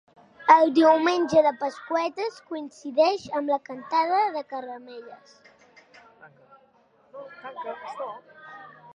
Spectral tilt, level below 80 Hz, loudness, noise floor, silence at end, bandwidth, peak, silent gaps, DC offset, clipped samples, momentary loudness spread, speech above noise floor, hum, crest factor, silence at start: -4.5 dB/octave; -72 dBFS; -23 LUFS; -61 dBFS; 0.3 s; 10 kHz; -2 dBFS; none; under 0.1%; under 0.1%; 25 LU; 37 dB; none; 24 dB; 0.4 s